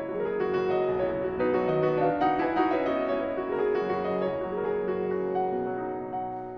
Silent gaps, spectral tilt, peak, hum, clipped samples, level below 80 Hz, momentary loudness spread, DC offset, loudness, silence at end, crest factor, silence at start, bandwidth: none; -8.5 dB/octave; -12 dBFS; none; under 0.1%; -56 dBFS; 5 LU; under 0.1%; -28 LUFS; 0 s; 16 dB; 0 s; 5.8 kHz